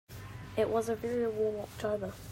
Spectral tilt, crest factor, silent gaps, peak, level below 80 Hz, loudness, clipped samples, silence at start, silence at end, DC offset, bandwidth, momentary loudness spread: -6 dB/octave; 16 dB; none; -18 dBFS; -58 dBFS; -34 LUFS; under 0.1%; 0.1 s; 0 s; under 0.1%; 16 kHz; 9 LU